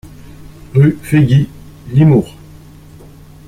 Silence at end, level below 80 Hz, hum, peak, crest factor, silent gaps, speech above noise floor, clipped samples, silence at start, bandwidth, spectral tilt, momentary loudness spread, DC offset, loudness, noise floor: 1.2 s; -40 dBFS; none; 0 dBFS; 14 dB; none; 27 dB; under 0.1%; 0.4 s; 13.5 kHz; -8.5 dB/octave; 10 LU; under 0.1%; -12 LUFS; -37 dBFS